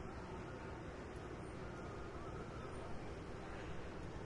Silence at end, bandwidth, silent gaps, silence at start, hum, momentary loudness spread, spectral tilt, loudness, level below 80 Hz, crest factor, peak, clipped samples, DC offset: 0 s; 11 kHz; none; 0 s; none; 1 LU; -6.5 dB/octave; -50 LUFS; -56 dBFS; 12 dB; -36 dBFS; under 0.1%; under 0.1%